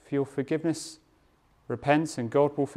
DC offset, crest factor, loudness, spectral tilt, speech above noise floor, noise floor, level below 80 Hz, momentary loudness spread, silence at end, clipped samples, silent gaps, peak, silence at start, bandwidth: under 0.1%; 20 dB; -28 LUFS; -6 dB/octave; 37 dB; -64 dBFS; -64 dBFS; 11 LU; 0 s; under 0.1%; none; -8 dBFS; 0.1 s; 13.5 kHz